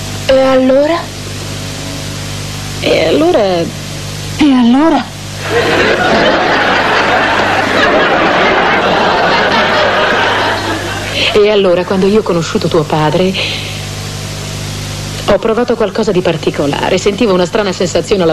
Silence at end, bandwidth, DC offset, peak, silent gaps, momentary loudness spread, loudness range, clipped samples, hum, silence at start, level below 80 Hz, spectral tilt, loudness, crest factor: 0 s; 13 kHz; 0.6%; -2 dBFS; none; 12 LU; 5 LU; under 0.1%; 50 Hz at -30 dBFS; 0 s; -34 dBFS; -4.5 dB/octave; -11 LUFS; 10 dB